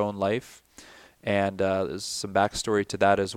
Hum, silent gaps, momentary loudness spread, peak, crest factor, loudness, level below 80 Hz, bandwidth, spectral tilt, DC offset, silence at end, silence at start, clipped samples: none; none; 8 LU; -8 dBFS; 20 dB; -26 LUFS; -56 dBFS; 16 kHz; -4.5 dB/octave; under 0.1%; 0 s; 0 s; under 0.1%